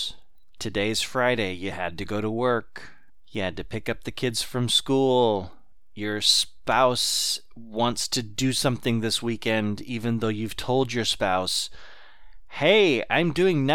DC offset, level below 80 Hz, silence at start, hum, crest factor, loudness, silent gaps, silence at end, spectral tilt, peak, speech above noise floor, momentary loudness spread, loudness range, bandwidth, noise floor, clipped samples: 1%; -52 dBFS; 0 s; none; 20 dB; -24 LUFS; none; 0 s; -3.5 dB/octave; -6 dBFS; 25 dB; 11 LU; 5 LU; 17.5 kHz; -49 dBFS; under 0.1%